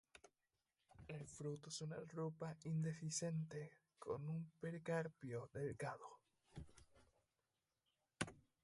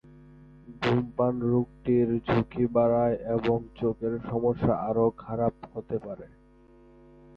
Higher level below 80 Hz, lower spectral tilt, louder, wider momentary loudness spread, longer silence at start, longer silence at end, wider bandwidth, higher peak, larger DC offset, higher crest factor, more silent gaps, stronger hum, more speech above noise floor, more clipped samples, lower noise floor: second, -74 dBFS vs -52 dBFS; second, -5.5 dB/octave vs -9.5 dB/octave; second, -49 LUFS vs -27 LUFS; first, 16 LU vs 10 LU; second, 0.15 s vs 0.65 s; second, 0.25 s vs 1.1 s; first, 11.5 kHz vs 6.6 kHz; second, -28 dBFS vs -12 dBFS; neither; first, 22 dB vs 16 dB; neither; neither; first, over 42 dB vs 29 dB; neither; first, under -90 dBFS vs -56 dBFS